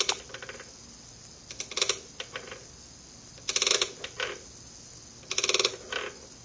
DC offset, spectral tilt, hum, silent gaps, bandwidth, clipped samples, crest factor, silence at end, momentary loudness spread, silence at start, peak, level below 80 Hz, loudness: under 0.1%; 0 dB/octave; none; none; 8 kHz; under 0.1%; 28 dB; 0 s; 22 LU; 0 s; -6 dBFS; -60 dBFS; -29 LUFS